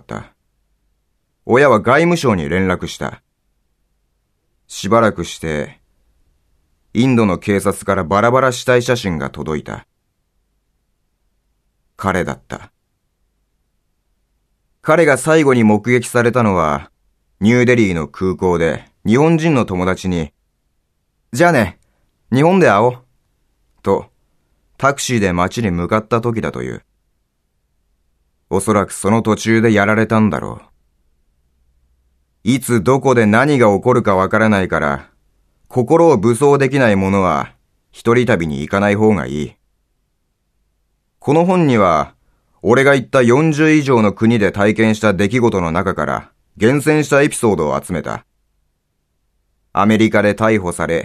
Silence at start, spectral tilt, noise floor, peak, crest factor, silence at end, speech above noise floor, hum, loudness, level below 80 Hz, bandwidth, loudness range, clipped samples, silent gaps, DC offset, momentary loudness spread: 0.1 s; -6 dB/octave; -67 dBFS; 0 dBFS; 16 dB; 0 s; 53 dB; none; -14 LUFS; -44 dBFS; 14 kHz; 8 LU; under 0.1%; none; under 0.1%; 12 LU